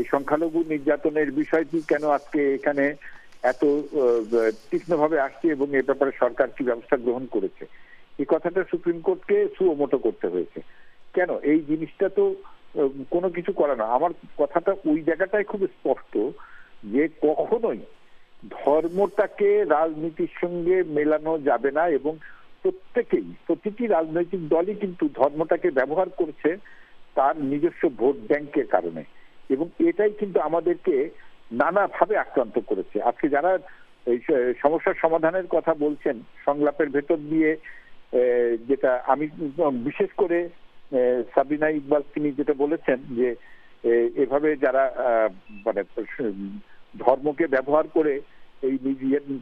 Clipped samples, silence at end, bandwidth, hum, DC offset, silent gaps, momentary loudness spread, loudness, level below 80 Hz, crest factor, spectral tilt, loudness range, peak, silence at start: under 0.1%; 0 s; 7.2 kHz; none; under 0.1%; none; 7 LU; -24 LUFS; -58 dBFS; 22 dB; -8 dB/octave; 2 LU; -2 dBFS; 0 s